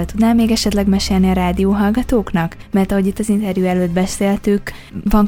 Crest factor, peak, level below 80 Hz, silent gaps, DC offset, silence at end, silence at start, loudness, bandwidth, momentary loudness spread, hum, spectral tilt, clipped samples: 14 dB; 0 dBFS; -28 dBFS; none; under 0.1%; 0 s; 0 s; -16 LUFS; 18 kHz; 5 LU; none; -6 dB/octave; under 0.1%